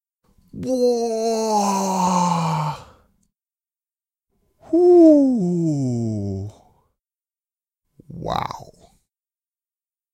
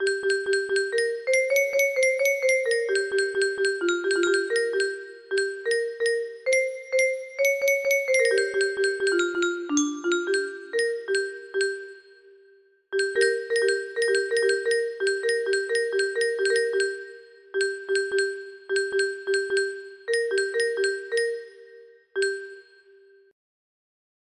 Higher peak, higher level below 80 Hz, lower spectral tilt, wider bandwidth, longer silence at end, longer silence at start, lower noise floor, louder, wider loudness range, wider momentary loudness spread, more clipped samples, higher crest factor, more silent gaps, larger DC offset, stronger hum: first, -2 dBFS vs -8 dBFS; first, -56 dBFS vs -72 dBFS; first, -6.5 dB/octave vs -0.5 dB/octave; first, 15.5 kHz vs 12 kHz; second, 1.5 s vs 1.7 s; first, 0.55 s vs 0 s; first, under -90 dBFS vs -58 dBFS; first, -19 LUFS vs -25 LUFS; first, 16 LU vs 5 LU; first, 20 LU vs 7 LU; neither; about the same, 18 dB vs 16 dB; neither; neither; neither